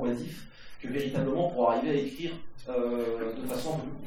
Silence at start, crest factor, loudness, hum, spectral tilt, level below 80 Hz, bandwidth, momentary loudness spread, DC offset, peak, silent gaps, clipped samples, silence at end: 0 s; 18 dB; -31 LUFS; none; -6.5 dB/octave; -54 dBFS; 19 kHz; 16 LU; under 0.1%; -12 dBFS; none; under 0.1%; 0 s